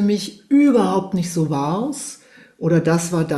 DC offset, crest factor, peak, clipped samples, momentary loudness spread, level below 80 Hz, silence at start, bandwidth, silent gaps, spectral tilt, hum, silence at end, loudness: under 0.1%; 12 dB; -6 dBFS; under 0.1%; 11 LU; -58 dBFS; 0 s; 12.5 kHz; none; -6 dB/octave; none; 0 s; -19 LUFS